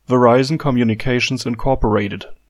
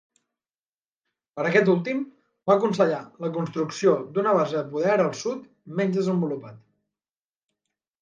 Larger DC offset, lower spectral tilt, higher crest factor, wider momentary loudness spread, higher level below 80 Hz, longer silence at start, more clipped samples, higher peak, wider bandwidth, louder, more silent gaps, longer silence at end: neither; about the same, -6 dB/octave vs -6.5 dB/octave; about the same, 16 dB vs 20 dB; second, 7 LU vs 12 LU; first, -32 dBFS vs -74 dBFS; second, 0.1 s vs 1.35 s; neither; first, 0 dBFS vs -6 dBFS; first, 12.5 kHz vs 9.2 kHz; first, -17 LUFS vs -24 LUFS; neither; second, 0.15 s vs 1.45 s